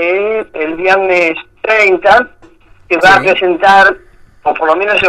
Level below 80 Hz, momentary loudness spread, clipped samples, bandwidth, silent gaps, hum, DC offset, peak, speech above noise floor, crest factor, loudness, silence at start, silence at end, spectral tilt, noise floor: -44 dBFS; 12 LU; 0.1%; 13.5 kHz; none; none; under 0.1%; 0 dBFS; 32 dB; 10 dB; -10 LUFS; 0 s; 0 s; -4 dB/octave; -41 dBFS